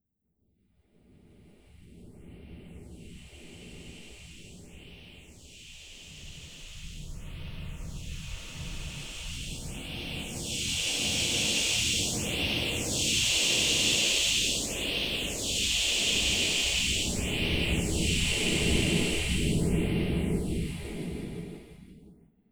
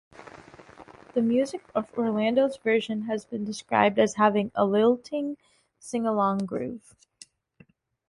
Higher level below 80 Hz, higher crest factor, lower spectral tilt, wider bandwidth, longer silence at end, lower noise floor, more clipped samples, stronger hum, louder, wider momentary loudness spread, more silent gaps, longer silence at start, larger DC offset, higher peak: first, -42 dBFS vs -68 dBFS; about the same, 18 dB vs 20 dB; second, -2.5 dB/octave vs -5.5 dB/octave; first, over 20 kHz vs 11.5 kHz; second, 0.4 s vs 1.3 s; first, -76 dBFS vs -59 dBFS; neither; neither; about the same, -27 LUFS vs -26 LUFS; first, 24 LU vs 13 LU; neither; first, 1.8 s vs 0.2 s; neither; second, -12 dBFS vs -6 dBFS